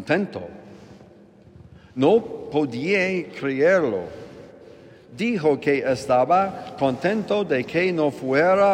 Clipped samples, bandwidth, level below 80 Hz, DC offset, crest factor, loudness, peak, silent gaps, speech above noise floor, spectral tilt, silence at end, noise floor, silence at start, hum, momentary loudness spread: under 0.1%; 11 kHz; -62 dBFS; under 0.1%; 16 dB; -22 LUFS; -6 dBFS; none; 28 dB; -6.5 dB/octave; 0 s; -49 dBFS; 0 s; none; 12 LU